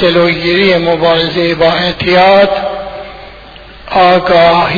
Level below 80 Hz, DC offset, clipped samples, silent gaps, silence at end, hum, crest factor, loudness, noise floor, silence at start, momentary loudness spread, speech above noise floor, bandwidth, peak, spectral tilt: -36 dBFS; under 0.1%; 0.2%; none; 0 s; none; 10 dB; -9 LUFS; -32 dBFS; 0 s; 13 LU; 24 dB; 5.4 kHz; 0 dBFS; -6.5 dB/octave